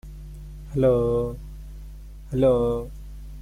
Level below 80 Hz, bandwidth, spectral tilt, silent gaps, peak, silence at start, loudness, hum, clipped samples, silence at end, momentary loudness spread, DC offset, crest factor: -38 dBFS; 15 kHz; -9 dB/octave; none; -10 dBFS; 0.05 s; -23 LUFS; none; under 0.1%; 0 s; 22 LU; under 0.1%; 16 dB